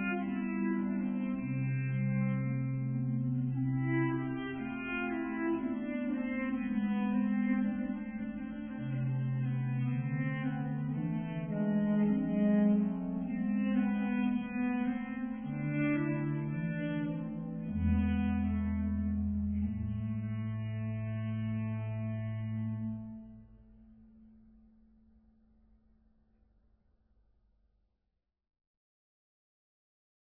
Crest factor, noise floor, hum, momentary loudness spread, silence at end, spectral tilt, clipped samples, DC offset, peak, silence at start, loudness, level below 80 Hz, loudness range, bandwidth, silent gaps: 16 dB; -84 dBFS; none; 7 LU; 6.1 s; -11.5 dB/octave; under 0.1%; under 0.1%; -18 dBFS; 0 s; -34 LUFS; -52 dBFS; 7 LU; 3.4 kHz; none